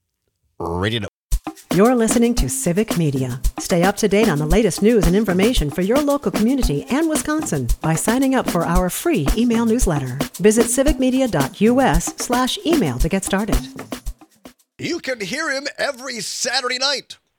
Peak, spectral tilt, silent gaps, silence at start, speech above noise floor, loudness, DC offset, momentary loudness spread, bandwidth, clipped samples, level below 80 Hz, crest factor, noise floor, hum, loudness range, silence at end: -2 dBFS; -4.5 dB/octave; 1.09-1.29 s; 0.6 s; 52 dB; -19 LUFS; under 0.1%; 10 LU; 19.5 kHz; under 0.1%; -28 dBFS; 18 dB; -70 dBFS; none; 5 LU; 0.25 s